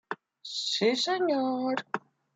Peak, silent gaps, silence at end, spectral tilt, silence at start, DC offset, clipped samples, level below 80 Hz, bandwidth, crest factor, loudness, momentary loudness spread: -12 dBFS; none; 0.4 s; -3 dB/octave; 0.1 s; under 0.1%; under 0.1%; -82 dBFS; 9.4 kHz; 18 dB; -29 LUFS; 12 LU